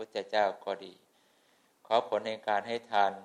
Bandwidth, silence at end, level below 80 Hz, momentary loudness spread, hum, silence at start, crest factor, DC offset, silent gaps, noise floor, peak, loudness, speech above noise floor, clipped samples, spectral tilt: 11 kHz; 0 s; -82 dBFS; 10 LU; none; 0 s; 22 dB; under 0.1%; none; -68 dBFS; -10 dBFS; -32 LUFS; 37 dB; under 0.1%; -4 dB/octave